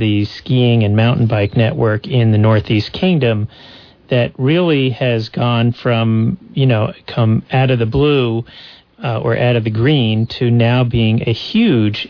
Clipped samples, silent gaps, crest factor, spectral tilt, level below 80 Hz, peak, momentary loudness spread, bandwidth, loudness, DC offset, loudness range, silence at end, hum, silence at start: under 0.1%; none; 10 dB; -9 dB/octave; -42 dBFS; -4 dBFS; 6 LU; 5.4 kHz; -15 LUFS; under 0.1%; 2 LU; 0 s; none; 0 s